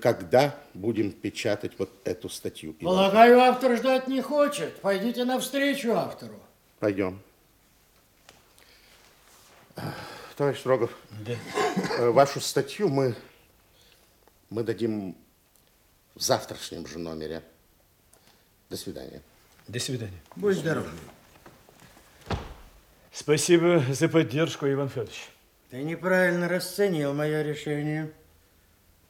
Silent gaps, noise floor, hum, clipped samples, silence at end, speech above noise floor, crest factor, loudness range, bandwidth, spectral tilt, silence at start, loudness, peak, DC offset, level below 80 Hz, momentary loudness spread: none; -62 dBFS; none; under 0.1%; 1 s; 37 dB; 24 dB; 14 LU; 17.5 kHz; -5 dB/octave; 0 s; -26 LUFS; -4 dBFS; under 0.1%; -60 dBFS; 18 LU